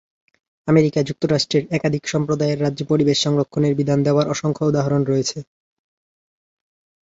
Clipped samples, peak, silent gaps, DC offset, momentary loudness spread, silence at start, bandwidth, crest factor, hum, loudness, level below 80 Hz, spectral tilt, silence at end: under 0.1%; -2 dBFS; none; under 0.1%; 5 LU; 0.65 s; 8 kHz; 18 dB; none; -19 LUFS; -56 dBFS; -6 dB/octave; 1.6 s